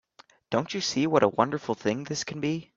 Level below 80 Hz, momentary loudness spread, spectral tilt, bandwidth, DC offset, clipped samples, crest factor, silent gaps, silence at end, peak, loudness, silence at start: -66 dBFS; 8 LU; -4.5 dB/octave; 7.8 kHz; under 0.1%; under 0.1%; 22 dB; none; 0.1 s; -6 dBFS; -27 LUFS; 0.5 s